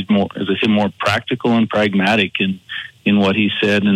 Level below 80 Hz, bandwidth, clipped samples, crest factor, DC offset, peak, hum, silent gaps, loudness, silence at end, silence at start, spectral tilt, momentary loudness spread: -60 dBFS; 10.5 kHz; under 0.1%; 14 dB; under 0.1%; -2 dBFS; none; none; -16 LUFS; 0 s; 0 s; -6 dB/octave; 6 LU